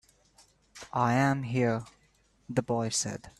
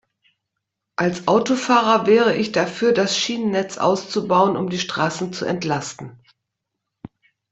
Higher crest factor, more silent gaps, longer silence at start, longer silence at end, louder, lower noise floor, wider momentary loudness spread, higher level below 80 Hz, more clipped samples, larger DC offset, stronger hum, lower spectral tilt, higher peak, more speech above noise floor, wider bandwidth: about the same, 18 dB vs 18 dB; neither; second, 0.75 s vs 1 s; second, 0.1 s vs 1.35 s; second, -29 LUFS vs -19 LUFS; second, -67 dBFS vs -80 dBFS; about the same, 10 LU vs 10 LU; about the same, -62 dBFS vs -62 dBFS; neither; neither; neither; about the same, -5 dB/octave vs -4.5 dB/octave; second, -12 dBFS vs -2 dBFS; second, 38 dB vs 61 dB; first, 12.5 kHz vs 8.2 kHz